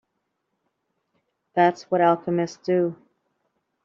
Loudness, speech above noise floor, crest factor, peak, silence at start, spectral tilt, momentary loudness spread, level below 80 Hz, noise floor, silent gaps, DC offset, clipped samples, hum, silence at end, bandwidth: -23 LUFS; 56 dB; 20 dB; -6 dBFS; 1.55 s; -5.5 dB/octave; 7 LU; -74 dBFS; -77 dBFS; none; under 0.1%; under 0.1%; none; 0.9 s; 7.4 kHz